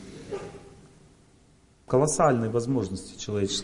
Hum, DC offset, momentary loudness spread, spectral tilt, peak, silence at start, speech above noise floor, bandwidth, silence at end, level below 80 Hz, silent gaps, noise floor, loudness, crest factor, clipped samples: none; under 0.1%; 16 LU; -5 dB/octave; -8 dBFS; 0 s; 33 dB; 11 kHz; 0 s; -54 dBFS; none; -59 dBFS; -27 LUFS; 20 dB; under 0.1%